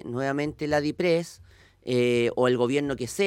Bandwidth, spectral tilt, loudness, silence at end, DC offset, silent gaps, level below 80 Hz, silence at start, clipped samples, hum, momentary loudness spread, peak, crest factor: 16 kHz; -5.5 dB/octave; -25 LUFS; 0 s; under 0.1%; none; -56 dBFS; 0.05 s; under 0.1%; none; 7 LU; -10 dBFS; 16 dB